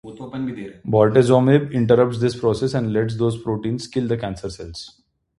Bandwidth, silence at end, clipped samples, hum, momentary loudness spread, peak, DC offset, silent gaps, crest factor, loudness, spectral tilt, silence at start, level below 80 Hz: 11.5 kHz; 0.5 s; under 0.1%; none; 17 LU; -2 dBFS; under 0.1%; none; 18 dB; -19 LUFS; -7.5 dB/octave; 0.05 s; -48 dBFS